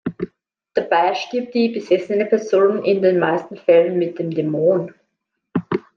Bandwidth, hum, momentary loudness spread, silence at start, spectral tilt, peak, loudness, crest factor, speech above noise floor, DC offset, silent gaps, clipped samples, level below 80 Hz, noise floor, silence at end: 7 kHz; none; 11 LU; 0.05 s; -7 dB/octave; -2 dBFS; -19 LUFS; 16 dB; 58 dB; under 0.1%; none; under 0.1%; -66 dBFS; -75 dBFS; 0.15 s